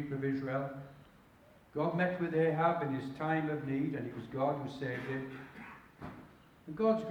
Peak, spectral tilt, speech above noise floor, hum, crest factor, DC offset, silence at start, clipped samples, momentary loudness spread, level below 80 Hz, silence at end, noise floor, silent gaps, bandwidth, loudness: -16 dBFS; -8.5 dB/octave; 27 dB; none; 18 dB; under 0.1%; 0 s; under 0.1%; 18 LU; -68 dBFS; 0 s; -61 dBFS; none; 19.5 kHz; -35 LUFS